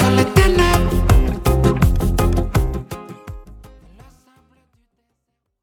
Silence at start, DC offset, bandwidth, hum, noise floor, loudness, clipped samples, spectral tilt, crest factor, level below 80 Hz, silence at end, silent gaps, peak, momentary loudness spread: 0 s; under 0.1%; 19 kHz; none; -74 dBFS; -17 LUFS; under 0.1%; -6 dB/octave; 18 dB; -22 dBFS; 2.1 s; none; 0 dBFS; 21 LU